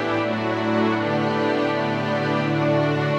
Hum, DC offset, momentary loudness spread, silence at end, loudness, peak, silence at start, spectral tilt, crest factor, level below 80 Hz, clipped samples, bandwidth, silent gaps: none; under 0.1%; 3 LU; 0 s; -22 LUFS; -8 dBFS; 0 s; -7 dB/octave; 12 dB; -62 dBFS; under 0.1%; 8.8 kHz; none